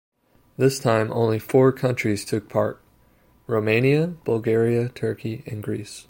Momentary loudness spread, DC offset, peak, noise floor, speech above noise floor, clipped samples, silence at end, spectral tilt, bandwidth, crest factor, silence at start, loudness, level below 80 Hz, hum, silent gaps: 11 LU; under 0.1%; -4 dBFS; -58 dBFS; 36 dB; under 0.1%; 0.1 s; -6.5 dB/octave; 17 kHz; 18 dB; 0.6 s; -22 LUFS; -60 dBFS; none; none